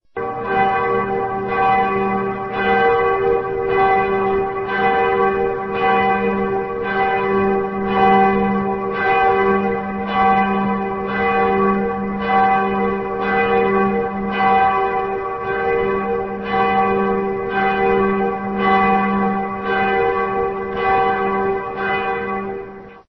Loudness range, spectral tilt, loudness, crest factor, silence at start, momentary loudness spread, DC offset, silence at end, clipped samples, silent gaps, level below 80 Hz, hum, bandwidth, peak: 2 LU; -8.5 dB/octave; -18 LUFS; 14 dB; 0.15 s; 7 LU; 0.2%; 0.1 s; under 0.1%; none; -44 dBFS; none; 6 kHz; -4 dBFS